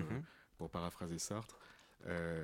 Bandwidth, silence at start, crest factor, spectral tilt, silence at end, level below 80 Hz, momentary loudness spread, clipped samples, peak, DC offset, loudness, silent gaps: 16.5 kHz; 0 s; 20 dB; -5 dB/octave; 0 s; -64 dBFS; 14 LU; under 0.1%; -26 dBFS; under 0.1%; -45 LUFS; none